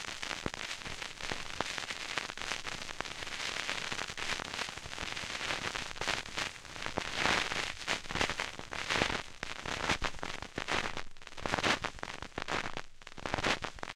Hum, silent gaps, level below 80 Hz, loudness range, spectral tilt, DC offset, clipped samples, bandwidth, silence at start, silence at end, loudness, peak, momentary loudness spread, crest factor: none; none; -52 dBFS; 3 LU; -2 dB/octave; under 0.1%; under 0.1%; 15.5 kHz; 0 s; 0 s; -36 LUFS; -10 dBFS; 9 LU; 28 dB